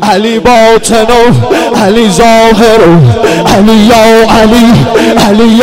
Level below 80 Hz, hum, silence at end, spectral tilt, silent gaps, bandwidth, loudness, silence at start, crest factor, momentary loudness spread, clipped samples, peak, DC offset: -24 dBFS; none; 0 s; -5.5 dB/octave; none; 16.5 kHz; -4 LUFS; 0 s; 4 dB; 4 LU; 9%; 0 dBFS; 4%